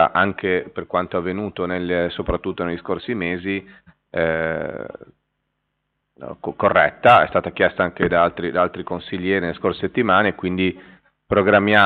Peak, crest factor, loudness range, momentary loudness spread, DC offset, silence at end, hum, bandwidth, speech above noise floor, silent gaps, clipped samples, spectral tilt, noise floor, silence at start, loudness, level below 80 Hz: -4 dBFS; 18 dB; 8 LU; 13 LU; under 0.1%; 0 s; none; 4.8 kHz; 55 dB; none; under 0.1%; -3.5 dB/octave; -74 dBFS; 0 s; -20 LUFS; -46 dBFS